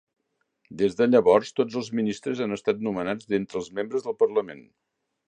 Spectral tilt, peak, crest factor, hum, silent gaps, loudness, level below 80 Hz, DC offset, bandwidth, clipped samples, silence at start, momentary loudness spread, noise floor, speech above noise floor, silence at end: -6 dB/octave; -6 dBFS; 20 dB; none; none; -25 LUFS; -64 dBFS; under 0.1%; 9.4 kHz; under 0.1%; 0.7 s; 10 LU; -71 dBFS; 46 dB; 0.65 s